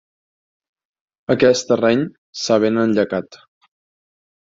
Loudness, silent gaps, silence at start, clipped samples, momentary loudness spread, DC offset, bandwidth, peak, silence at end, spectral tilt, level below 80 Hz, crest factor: -18 LUFS; 2.18-2.33 s; 1.3 s; under 0.1%; 12 LU; under 0.1%; 7.8 kHz; -2 dBFS; 1.15 s; -5 dB/octave; -60 dBFS; 18 dB